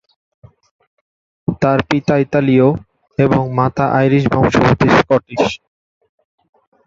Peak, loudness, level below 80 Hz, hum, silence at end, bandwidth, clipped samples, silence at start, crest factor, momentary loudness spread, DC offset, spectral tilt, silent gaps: 0 dBFS; -14 LUFS; -42 dBFS; none; 1.3 s; 7.6 kHz; under 0.1%; 1.5 s; 14 dB; 10 LU; under 0.1%; -7.5 dB/octave; none